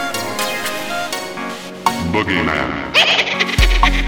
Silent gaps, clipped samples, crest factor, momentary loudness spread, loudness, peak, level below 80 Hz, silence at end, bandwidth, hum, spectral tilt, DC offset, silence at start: none; under 0.1%; 18 dB; 11 LU; -17 LUFS; 0 dBFS; -24 dBFS; 0 s; over 20 kHz; none; -3.5 dB/octave; under 0.1%; 0 s